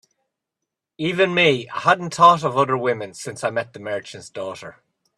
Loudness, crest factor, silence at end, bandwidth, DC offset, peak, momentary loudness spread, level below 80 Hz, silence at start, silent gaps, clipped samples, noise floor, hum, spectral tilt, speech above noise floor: -19 LUFS; 20 dB; 0.45 s; 12.5 kHz; under 0.1%; 0 dBFS; 17 LU; -64 dBFS; 1 s; none; under 0.1%; -83 dBFS; none; -4.5 dB/octave; 63 dB